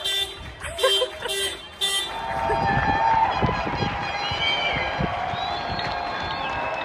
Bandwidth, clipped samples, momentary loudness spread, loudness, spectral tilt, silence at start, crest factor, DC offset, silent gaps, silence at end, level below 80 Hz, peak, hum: 16 kHz; under 0.1%; 7 LU; -24 LUFS; -3 dB/octave; 0 s; 18 dB; under 0.1%; none; 0 s; -42 dBFS; -8 dBFS; none